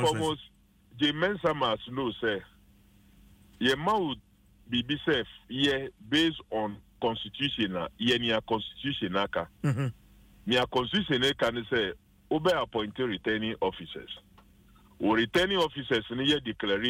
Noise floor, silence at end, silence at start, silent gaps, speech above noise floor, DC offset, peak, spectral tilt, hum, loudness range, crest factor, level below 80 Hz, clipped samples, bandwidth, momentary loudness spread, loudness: -59 dBFS; 0 s; 0 s; none; 30 dB; under 0.1%; -14 dBFS; -5 dB/octave; none; 3 LU; 16 dB; -56 dBFS; under 0.1%; 16 kHz; 8 LU; -29 LUFS